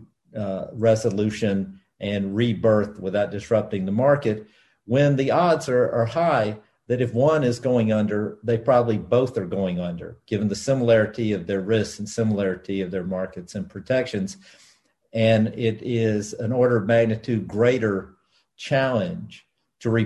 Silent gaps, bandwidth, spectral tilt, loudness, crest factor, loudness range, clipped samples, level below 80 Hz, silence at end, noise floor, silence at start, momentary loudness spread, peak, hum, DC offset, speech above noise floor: none; 12 kHz; -7 dB/octave; -23 LUFS; 18 dB; 4 LU; under 0.1%; -54 dBFS; 0 s; -59 dBFS; 0 s; 11 LU; -4 dBFS; none; under 0.1%; 37 dB